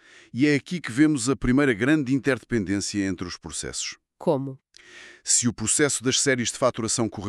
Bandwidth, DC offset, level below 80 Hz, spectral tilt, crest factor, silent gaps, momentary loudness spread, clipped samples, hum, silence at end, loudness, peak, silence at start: 13 kHz; under 0.1%; -48 dBFS; -3.5 dB/octave; 18 dB; none; 11 LU; under 0.1%; none; 0 s; -23 LUFS; -6 dBFS; 0.35 s